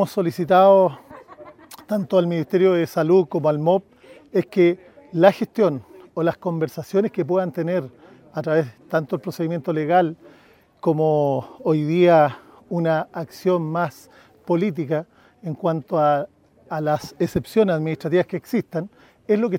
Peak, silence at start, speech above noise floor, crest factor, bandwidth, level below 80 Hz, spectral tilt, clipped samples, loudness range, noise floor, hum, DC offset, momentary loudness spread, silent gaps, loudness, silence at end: 0 dBFS; 0 s; 33 dB; 20 dB; 16.5 kHz; -60 dBFS; -7.5 dB/octave; under 0.1%; 5 LU; -53 dBFS; none; under 0.1%; 13 LU; none; -21 LUFS; 0 s